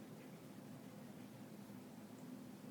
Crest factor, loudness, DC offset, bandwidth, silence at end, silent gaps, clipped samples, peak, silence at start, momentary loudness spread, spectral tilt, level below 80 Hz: 12 dB; -56 LUFS; under 0.1%; over 20 kHz; 0 s; none; under 0.1%; -42 dBFS; 0 s; 2 LU; -6 dB/octave; -88 dBFS